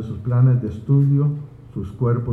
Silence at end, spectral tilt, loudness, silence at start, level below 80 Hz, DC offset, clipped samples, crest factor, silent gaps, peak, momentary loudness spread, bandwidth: 0 s; -11.5 dB/octave; -19 LUFS; 0 s; -46 dBFS; under 0.1%; under 0.1%; 12 dB; none; -6 dBFS; 15 LU; 2.6 kHz